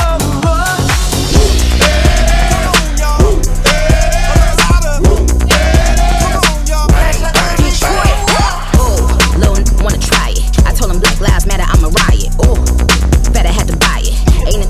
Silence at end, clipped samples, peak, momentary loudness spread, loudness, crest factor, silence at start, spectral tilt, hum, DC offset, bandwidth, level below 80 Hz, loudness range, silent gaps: 0 s; under 0.1%; 0 dBFS; 3 LU; -11 LUFS; 8 dB; 0 s; -4 dB/octave; none; under 0.1%; 15.5 kHz; -10 dBFS; 1 LU; none